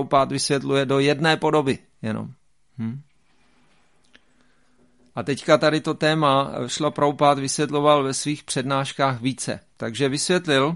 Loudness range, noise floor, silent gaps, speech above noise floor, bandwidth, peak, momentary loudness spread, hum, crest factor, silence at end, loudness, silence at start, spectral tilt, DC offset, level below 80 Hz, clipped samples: 14 LU; -63 dBFS; none; 42 dB; 11.5 kHz; -2 dBFS; 13 LU; none; 20 dB; 0 s; -22 LUFS; 0 s; -4.5 dB/octave; 0.1%; -60 dBFS; under 0.1%